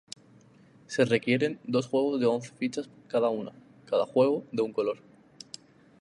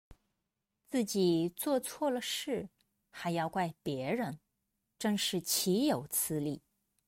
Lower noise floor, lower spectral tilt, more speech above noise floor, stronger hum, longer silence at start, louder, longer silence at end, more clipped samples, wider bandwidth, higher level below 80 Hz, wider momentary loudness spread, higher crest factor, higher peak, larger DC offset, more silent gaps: second, -57 dBFS vs -86 dBFS; first, -6 dB/octave vs -4 dB/octave; second, 30 dB vs 53 dB; neither; first, 0.9 s vs 0.1 s; first, -28 LUFS vs -34 LUFS; first, 1.05 s vs 0.5 s; neither; second, 11.5 kHz vs 16.5 kHz; second, -76 dBFS vs -70 dBFS; first, 20 LU vs 10 LU; about the same, 18 dB vs 16 dB; first, -10 dBFS vs -18 dBFS; neither; neither